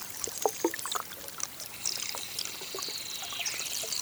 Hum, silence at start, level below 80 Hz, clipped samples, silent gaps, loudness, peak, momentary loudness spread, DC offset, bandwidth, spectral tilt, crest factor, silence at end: none; 0 s; -68 dBFS; under 0.1%; none; -33 LUFS; -10 dBFS; 5 LU; under 0.1%; over 20 kHz; -0.5 dB/octave; 26 dB; 0 s